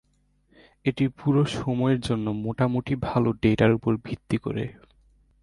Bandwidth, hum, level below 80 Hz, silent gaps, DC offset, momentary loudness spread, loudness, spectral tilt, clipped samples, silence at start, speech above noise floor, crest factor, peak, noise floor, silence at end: 11.5 kHz; none; -50 dBFS; none; under 0.1%; 9 LU; -25 LUFS; -7.5 dB/octave; under 0.1%; 0.85 s; 41 dB; 18 dB; -6 dBFS; -65 dBFS; 0.7 s